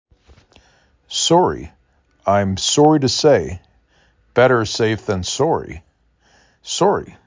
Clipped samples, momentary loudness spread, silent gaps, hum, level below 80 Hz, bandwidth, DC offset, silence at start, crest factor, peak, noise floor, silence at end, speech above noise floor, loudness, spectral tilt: under 0.1%; 17 LU; none; none; -44 dBFS; 7.8 kHz; under 0.1%; 1.1 s; 18 dB; -2 dBFS; -58 dBFS; 0.15 s; 42 dB; -17 LUFS; -4.5 dB/octave